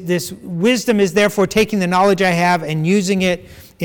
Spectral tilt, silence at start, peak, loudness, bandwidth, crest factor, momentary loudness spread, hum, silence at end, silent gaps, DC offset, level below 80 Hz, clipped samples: -5 dB/octave; 0 s; -6 dBFS; -16 LUFS; 19 kHz; 10 dB; 7 LU; none; 0 s; none; under 0.1%; -48 dBFS; under 0.1%